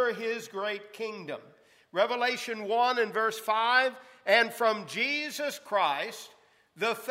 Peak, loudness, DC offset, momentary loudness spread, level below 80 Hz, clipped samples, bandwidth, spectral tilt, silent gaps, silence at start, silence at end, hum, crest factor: -10 dBFS; -29 LUFS; under 0.1%; 13 LU; -90 dBFS; under 0.1%; 16 kHz; -2.5 dB/octave; none; 0 s; 0 s; none; 20 dB